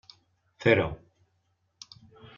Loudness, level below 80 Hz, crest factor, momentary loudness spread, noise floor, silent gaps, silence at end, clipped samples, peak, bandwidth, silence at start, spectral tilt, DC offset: -26 LUFS; -56 dBFS; 24 dB; 25 LU; -74 dBFS; none; 1.4 s; under 0.1%; -8 dBFS; 7.2 kHz; 0.6 s; -4.5 dB/octave; under 0.1%